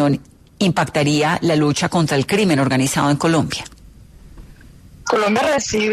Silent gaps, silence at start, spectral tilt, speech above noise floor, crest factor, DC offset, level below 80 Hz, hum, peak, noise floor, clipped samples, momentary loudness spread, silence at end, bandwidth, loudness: none; 0 s; -5 dB/octave; 26 dB; 14 dB; under 0.1%; -46 dBFS; none; -4 dBFS; -43 dBFS; under 0.1%; 7 LU; 0 s; 13.5 kHz; -17 LUFS